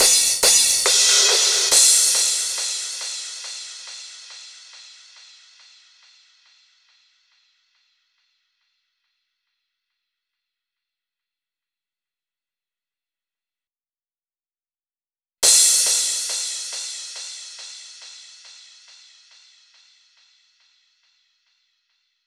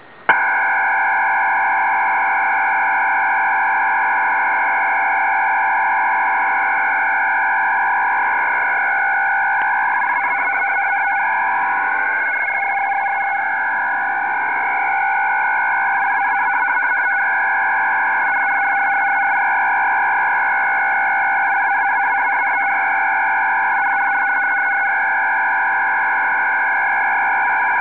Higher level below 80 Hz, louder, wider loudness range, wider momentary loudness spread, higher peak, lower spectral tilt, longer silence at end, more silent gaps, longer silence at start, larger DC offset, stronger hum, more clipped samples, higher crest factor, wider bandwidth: about the same, -64 dBFS vs -68 dBFS; about the same, -15 LUFS vs -16 LUFS; first, 23 LU vs 2 LU; first, 25 LU vs 2 LU; about the same, 0 dBFS vs -2 dBFS; second, 3.5 dB/octave vs -5 dB/octave; first, 4.05 s vs 0 s; neither; second, 0 s vs 0.2 s; second, under 0.1% vs 0.4%; neither; neither; first, 24 dB vs 16 dB; first, over 20 kHz vs 4 kHz